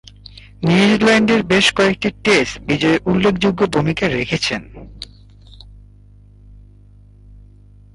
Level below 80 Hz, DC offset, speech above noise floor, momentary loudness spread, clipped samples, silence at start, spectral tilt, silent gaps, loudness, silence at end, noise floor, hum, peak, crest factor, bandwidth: -42 dBFS; under 0.1%; 29 dB; 12 LU; under 0.1%; 0.35 s; -5 dB/octave; none; -15 LUFS; 2.3 s; -44 dBFS; 50 Hz at -40 dBFS; -2 dBFS; 16 dB; 11.5 kHz